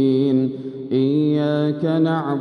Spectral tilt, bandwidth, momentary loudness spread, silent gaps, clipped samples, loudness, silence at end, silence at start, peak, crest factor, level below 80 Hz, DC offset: -9.5 dB/octave; 5.8 kHz; 6 LU; none; under 0.1%; -19 LUFS; 0 s; 0 s; -8 dBFS; 12 dB; -70 dBFS; under 0.1%